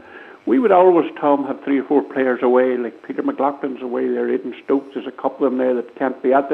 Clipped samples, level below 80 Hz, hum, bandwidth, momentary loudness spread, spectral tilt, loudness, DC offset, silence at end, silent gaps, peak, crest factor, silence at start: under 0.1%; -74 dBFS; none; 4.2 kHz; 10 LU; -8.5 dB/octave; -19 LUFS; under 0.1%; 0 s; none; 0 dBFS; 18 dB; 0.1 s